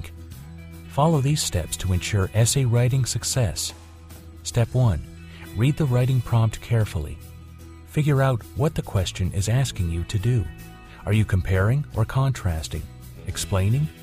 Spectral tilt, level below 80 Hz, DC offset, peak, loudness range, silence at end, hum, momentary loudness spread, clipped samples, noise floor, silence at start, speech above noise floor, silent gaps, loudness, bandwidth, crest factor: -5.5 dB/octave; -38 dBFS; under 0.1%; -6 dBFS; 3 LU; 0 s; none; 20 LU; under 0.1%; -42 dBFS; 0 s; 20 dB; none; -23 LUFS; 15.5 kHz; 16 dB